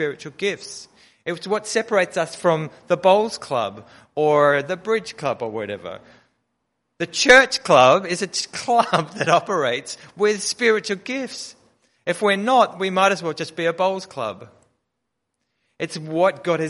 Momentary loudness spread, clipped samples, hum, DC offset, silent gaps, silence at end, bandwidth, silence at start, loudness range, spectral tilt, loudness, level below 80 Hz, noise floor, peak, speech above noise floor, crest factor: 15 LU; under 0.1%; none; under 0.1%; none; 0 s; 11.5 kHz; 0 s; 6 LU; -3.5 dB/octave; -20 LUFS; -60 dBFS; -78 dBFS; -2 dBFS; 58 dB; 20 dB